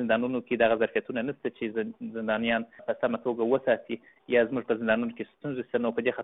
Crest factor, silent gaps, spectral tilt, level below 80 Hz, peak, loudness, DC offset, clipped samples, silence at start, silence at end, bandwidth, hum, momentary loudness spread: 18 dB; none; -3.5 dB/octave; -66 dBFS; -10 dBFS; -29 LUFS; under 0.1%; under 0.1%; 0 s; 0 s; 4 kHz; none; 10 LU